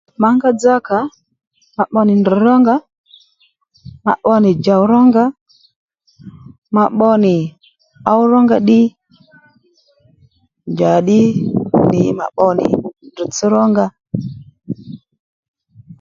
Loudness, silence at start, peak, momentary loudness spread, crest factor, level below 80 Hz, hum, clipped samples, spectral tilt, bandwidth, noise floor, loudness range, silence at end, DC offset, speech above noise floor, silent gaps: -13 LUFS; 0.2 s; 0 dBFS; 15 LU; 14 dB; -52 dBFS; none; under 0.1%; -7 dB/octave; 7.6 kHz; -58 dBFS; 3 LU; 0.05 s; under 0.1%; 46 dB; 1.47-1.51 s, 2.98-3.04 s, 5.41-5.46 s, 5.76-5.88 s, 6.58-6.62 s, 15.19-15.54 s